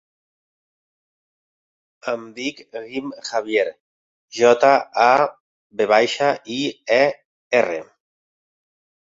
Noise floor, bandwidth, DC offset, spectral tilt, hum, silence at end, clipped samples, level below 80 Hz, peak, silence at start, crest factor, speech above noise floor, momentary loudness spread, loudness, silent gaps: under -90 dBFS; 7.8 kHz; under 0.1%; -3.5 dB/octave; none; 1.35 s; under 0.1%; -68 dBFS; -2 dBFS; 2.05 s; 20 dB; over 71 dB; 15 LU; -19 LUFS; 3.80-4.28 s, 5.40-5.70 s, 7.25-7.51 s